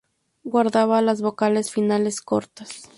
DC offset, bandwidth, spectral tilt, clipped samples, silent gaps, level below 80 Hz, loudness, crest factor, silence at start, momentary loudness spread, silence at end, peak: under 0.1%; 11.5 kHz; -5 dB/octave; under 0.1%; none; -66 dBFS; -21 LUFS; 16 dB; 0.45 s; 14 LU; 0.15 s; -6 dBFS